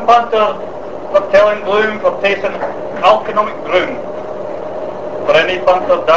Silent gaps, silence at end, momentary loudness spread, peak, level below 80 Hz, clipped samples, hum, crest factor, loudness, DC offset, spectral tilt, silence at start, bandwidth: none; 0 s; 13 LU; 0 dBFS; -48 dBFS; 0.1%; none; 14 dB; -14 LUFS; 3%; -4.5 dB/octave; 0 s; 8 kHz